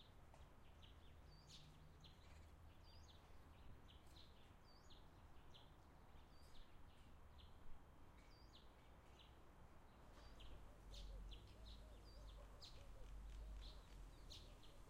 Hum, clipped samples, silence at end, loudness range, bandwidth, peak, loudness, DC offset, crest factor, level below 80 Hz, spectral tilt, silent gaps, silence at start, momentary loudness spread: none; under 0.1%; 0 s; 6 LU; 15 kHz; -44 dBFS; -65 LUFS; under 0.1%; 16 dB; -64 dBFS; -4.5 dB/octave; none; 0 s; 8 LU